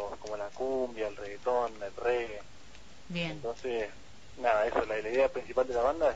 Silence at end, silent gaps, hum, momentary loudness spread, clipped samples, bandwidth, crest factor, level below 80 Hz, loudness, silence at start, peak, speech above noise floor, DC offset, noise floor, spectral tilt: 0 s; none; none; 11 LU; under 0.1%; 8 kHz; 18 dB; -56 dBFS; -33 LUFS; 0 s; -14 dBFS; 23 dB; 0.5%; -54 dBFS; -5 dB/octave